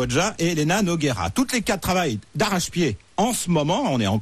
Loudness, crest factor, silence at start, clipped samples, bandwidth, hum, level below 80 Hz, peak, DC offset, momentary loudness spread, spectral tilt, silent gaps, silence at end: -22 LUFS; 12 dB; 0 s; under 0.1%; 14 kHz; none; -44 dBFS; -10 dBFS; under 0.1%; 4 LU; -4.5 dB/octave; none; 0 s